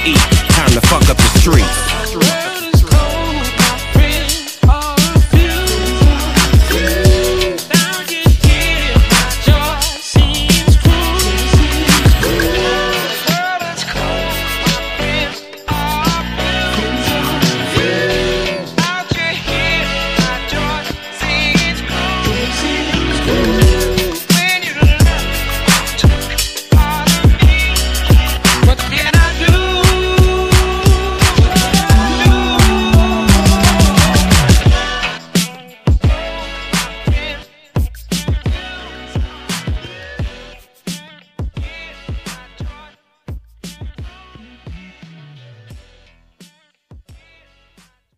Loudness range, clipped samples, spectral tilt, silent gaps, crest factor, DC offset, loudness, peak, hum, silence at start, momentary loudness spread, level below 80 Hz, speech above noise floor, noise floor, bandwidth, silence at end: 13 LU; under 0.1%; -4.5 dB/octave; none; 12 dB; under 0.1%; -13 LUFS; 0 dBFS; none; 0 s; 14 LU; -18 dBFS; 43 dB; -52 dBFS; 15.5 kHz; 1.15 s